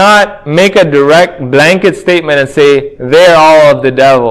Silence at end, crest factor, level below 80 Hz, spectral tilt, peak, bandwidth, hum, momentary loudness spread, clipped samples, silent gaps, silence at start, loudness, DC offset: 0 s; 6 dB; -42 dBFS; -5 dB/octave; 0 dBFS; 16 kHz; none; 7 LU; 7%; none; 0 s; -6 LUFS; under 0.1%